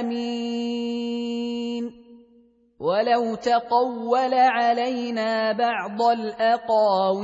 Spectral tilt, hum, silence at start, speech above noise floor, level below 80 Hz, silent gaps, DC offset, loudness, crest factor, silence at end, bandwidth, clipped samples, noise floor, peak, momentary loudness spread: -5 dB/octave; none; 0 s; 36 dB; -70 dBFS; none; under 0.1%; -23 LUFS; 16 dB; 0 s; 8 kHz; under 0.1%; -57 dBFS; -8 dBFS; 9 LU